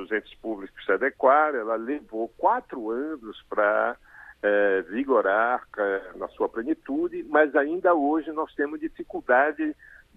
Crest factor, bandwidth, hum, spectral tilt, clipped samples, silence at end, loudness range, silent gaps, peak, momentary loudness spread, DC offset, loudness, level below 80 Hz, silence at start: 20 dB; 4.1 kHz; none; -7 dB/octave; under 0.1%; 0.45 s; 2 LU; none; -6 dBFS; 13 LU; under 0.1%; -25 LUFS; -60 dBFS; 0 s